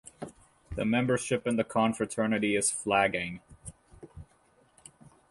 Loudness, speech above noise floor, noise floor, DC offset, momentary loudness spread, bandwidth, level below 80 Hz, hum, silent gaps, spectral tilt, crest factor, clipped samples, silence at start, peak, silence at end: -28 LUFS; 37 dB; -65 dBFS; under 0.1%; 22 LU; 11.5 kHz; -56 dBFS; none; none; -4 dB/octave; 20 dB; under 0.1%; 0.05 s; -12 dBFS; 0.25 s